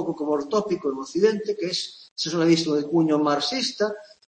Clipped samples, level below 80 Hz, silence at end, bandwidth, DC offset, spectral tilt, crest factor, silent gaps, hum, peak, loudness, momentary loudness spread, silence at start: under 0.1%; -68 dBFS; 0.25 s; 8.8 kHz; under 0.1%; -4.5 dB/octave; 16 dB; 2.11-2.16 s; none; -6 dBFS; -24 LUFS; 8 LU; 0 s